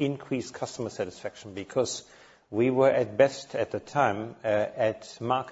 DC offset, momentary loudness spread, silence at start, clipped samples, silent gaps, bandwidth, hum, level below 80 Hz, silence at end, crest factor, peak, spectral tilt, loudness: under 0.1%; 13 LU; 0 s; under 0.1%; none; 8 kHz; none; -66 dBFS; 0 s; 20 dB; -8 dBFS; -5 dB/octave; -28 LUFS